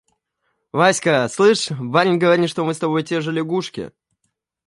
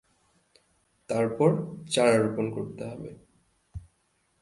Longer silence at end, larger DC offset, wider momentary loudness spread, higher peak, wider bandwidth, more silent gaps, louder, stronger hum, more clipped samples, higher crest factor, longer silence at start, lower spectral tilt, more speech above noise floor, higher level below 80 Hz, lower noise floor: first, 0.8 s vs 0.6 s; neither; second, 10 LU vs 24 LU; first, -2 dBFS vs -8 dBFS; about the same, 11.5 kHz vs 11.5 kHz; neither; first, -18 LUFS vs -27 LUFS; neither; neither; about the same, 18 dB vs 22 dB; second, 0.75 s vs 1.1 s; about the same, -5 dB/octave vs -5.5 dB/octave; first, 56 dB vs 45 dB; second, -64 dBFS vs -58 dBFS; about the same, -73 dBFS vs -71 dBFS